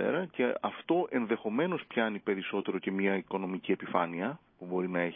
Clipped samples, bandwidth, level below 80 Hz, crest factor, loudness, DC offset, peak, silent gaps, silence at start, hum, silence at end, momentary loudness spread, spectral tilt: under 0.1%; 3.8 kHz; -76 dBFS; 20 dB; -32 LUFS; under 0.1%; -12 dBFS; none; 0 s; none; 0 s; 5 LU; -4.5 dB/octave